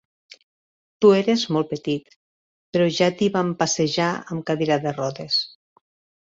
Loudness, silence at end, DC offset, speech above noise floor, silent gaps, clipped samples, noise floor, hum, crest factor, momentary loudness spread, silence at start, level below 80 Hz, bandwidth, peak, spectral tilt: -21 LUFS; 0.75 s; under 0.1%; over 69 dB; 2.16-2.73 s; under 0.1%; under -90 dBFS; none; 20 dB; 10 LU; 1 s; -64 dBFS; 7.8 kHz; -4 dBFS; -4.5 dB/octave